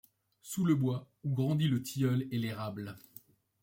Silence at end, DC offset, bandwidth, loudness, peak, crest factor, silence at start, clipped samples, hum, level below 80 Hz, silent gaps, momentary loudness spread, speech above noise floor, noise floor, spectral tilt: 0.65 s; under 0.1%; 16.5 kHz; -33 LUFS; -18 dBFS; 16 dB; 0.45 s; under 0.1%; none; -70 dBFS; none; 14 LU; 27 dB; -59 dBFS; -6.5 dB/octave